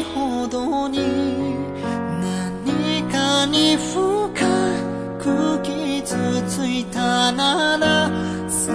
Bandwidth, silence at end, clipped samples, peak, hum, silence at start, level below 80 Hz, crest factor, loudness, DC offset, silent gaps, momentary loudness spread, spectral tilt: 11 kHz; 0 s; under 0.1%; -6 dBFS; none; 0 s; -48 dBFS; 16 dB; -20 LUFS; under 0.1%; none; 8 LU; -4 dB/octave